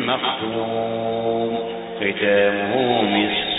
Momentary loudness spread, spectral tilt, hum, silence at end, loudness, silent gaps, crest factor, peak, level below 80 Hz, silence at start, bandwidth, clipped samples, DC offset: 7 LU; -10 dB/octave; none; 0 s; -21 LUFS; none; 16 dB; -4 dBFS; -56 dBFS; 0 s; 4 kHz; under 0.1%; under 0.1%